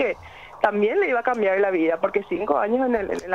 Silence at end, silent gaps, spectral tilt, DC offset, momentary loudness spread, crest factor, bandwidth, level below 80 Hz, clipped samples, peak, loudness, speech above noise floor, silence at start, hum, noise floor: 0 s; none; -6 dB/octave; 0.1%; 5 LU; 16 dB; 11 kHz; -54 dBFS; under 0.1%; -6 dBFS; -22 LUFS; 21 dB; 0 s; none; -42 dBFS